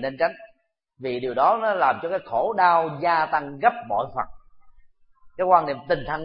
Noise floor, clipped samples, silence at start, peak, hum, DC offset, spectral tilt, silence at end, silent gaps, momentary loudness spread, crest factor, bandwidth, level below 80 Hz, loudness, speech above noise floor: -63 dBFS; under 0.1%; 0 s; -2 dBFS; none; under 0.1%; -9.5 dB/octave; 0 s; none; 10 LU; 20 dB; 5.4 kHz; -54 dBFS; -23 LUFS; 41 dB